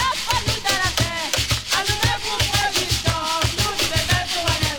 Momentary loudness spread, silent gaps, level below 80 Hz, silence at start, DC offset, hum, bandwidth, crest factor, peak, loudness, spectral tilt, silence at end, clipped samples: 2 LU; none; -34 dBFS; 0 s; under 0.1%; none; over 20 kHz; 18 dB; -4 dBFS; -20 LUFS; -2.5 dB/octave; 0 s; under 0.1%